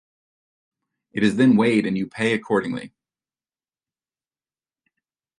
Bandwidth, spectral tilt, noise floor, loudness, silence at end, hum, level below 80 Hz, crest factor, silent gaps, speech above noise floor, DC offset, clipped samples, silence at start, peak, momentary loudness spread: 11 kHz; -6.5 dB/octave; under -90 dBFS; -20 LUFS; 2.5 s; none; -64 dBFS; 20 dB; none; over 70 dB; under 0.1%; under 0.1%; 1.15 s; -4 dBFS; 14 LU